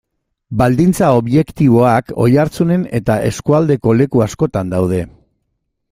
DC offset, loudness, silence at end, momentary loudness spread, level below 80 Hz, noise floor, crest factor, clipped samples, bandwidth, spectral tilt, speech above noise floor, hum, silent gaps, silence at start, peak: under 0.1%; -14 LUFS; 0.85 s; 6 LU; -40 dBFS; -70 dBFS; 14 dB; under 0.1%; 16 kHz; -7.5 dB/octave; 57 dB; none; none; 0.5 s; 0 dBFS